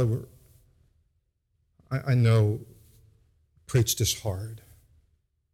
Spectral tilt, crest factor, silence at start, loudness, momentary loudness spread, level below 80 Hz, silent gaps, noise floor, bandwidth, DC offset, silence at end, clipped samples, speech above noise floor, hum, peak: -5 dB/octave; 16 dB; 0 s; -26 LUFS; 18 LU; -54 dBFS; none; -74 dBFS; 15.5 kHz; under 0.1%; 0.95 s; under 0.1%; 49 dB; none; -12 dBFS